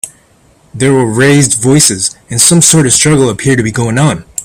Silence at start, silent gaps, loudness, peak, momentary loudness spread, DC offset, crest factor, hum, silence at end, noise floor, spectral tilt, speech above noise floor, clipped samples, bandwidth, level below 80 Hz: 0.05 s; none; -8 LUFS; 0 dBFS; 8 LU; under 0.1%; 10 dB; none; 0 s; -46 dBFS; -4 dB/octave; 38 dB; 0.5%; over 20 kHz; -40 dBFS